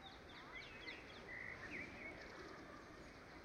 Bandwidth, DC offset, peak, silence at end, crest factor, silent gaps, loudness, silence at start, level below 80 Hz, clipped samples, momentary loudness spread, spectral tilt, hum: 15 kHz; under 0.1%; -38 dBFS; 0 s; 16 dB; none; -53 LUFS; 0 s; -68 dBFS; under 0.1%; 8 LU; -4 dB/octave; none